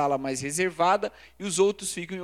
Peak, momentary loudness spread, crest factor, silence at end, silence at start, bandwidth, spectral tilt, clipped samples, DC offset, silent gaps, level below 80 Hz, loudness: -10 dBFS; 9 LU; 18 dB; 0 s; 0 s; 15 kHz; -3.5 dB/octave; under 0.1%; under 0.1%; none; -62 dBFS; -26 LUFS